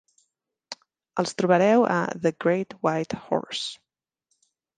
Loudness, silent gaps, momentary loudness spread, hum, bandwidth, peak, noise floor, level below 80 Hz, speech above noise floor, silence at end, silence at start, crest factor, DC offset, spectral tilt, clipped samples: -24 LUFS; none; 21 LU; none; 9.8 kHz; -6 dBFS; -76 dBFS; -68 dBFS; 53 dB; 1.05 s; 0.7 s; 20 dB; under 0.1%; -5.5 dB/octave; under 0.1%